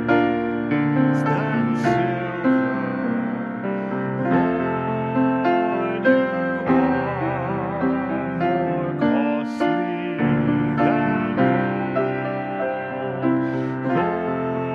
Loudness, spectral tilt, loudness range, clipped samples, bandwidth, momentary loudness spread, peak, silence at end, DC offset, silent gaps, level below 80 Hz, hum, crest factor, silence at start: -22 LUFS; -8.5 dB/octave; 2 LU; under 0.1%; 7.2 kHz; 6 LU; -4 dBFS; 0 s; under 0.1%; none; -52 dBFS; none; 16 dB; 0 s